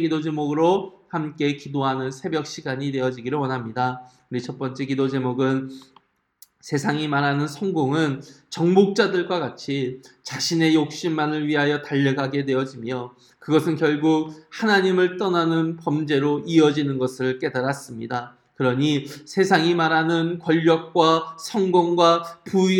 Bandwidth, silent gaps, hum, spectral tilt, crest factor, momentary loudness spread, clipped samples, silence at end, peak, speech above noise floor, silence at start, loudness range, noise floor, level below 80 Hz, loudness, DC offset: 17 kHz; none; none; -6 dB/octave; 20 dB; 12 LU; under 0.1%; 0 s; -2 dBFS; 37 dB; 0 s; 6 LU; -59 dBFS; -70 dBFS; -22 LUFS; under 0.1%